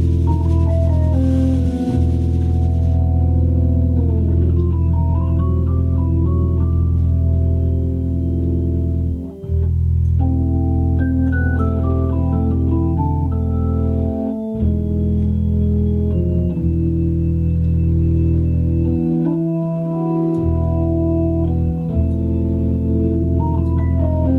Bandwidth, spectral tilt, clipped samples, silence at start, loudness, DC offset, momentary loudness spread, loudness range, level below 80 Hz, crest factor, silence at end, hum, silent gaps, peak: 2.8 kHz; -11 dB/octave; under 0.1%; 0 s; -18 LUFS; under 0.1%; 3 LU; 2 LU; -22 dBFS; 10 dB; 0 s; none; none; -6 dBFS